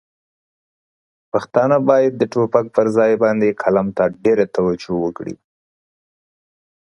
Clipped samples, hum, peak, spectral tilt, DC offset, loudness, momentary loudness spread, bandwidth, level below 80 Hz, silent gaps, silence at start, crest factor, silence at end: under 0.1%; none; 0 dBFS; -7.5 dB/octave; under 0.1%; -17 LUFS; 9 LU; 10.5 kHz; -56 dBFS; none; 1.35 s; 18 dB; 1.5 s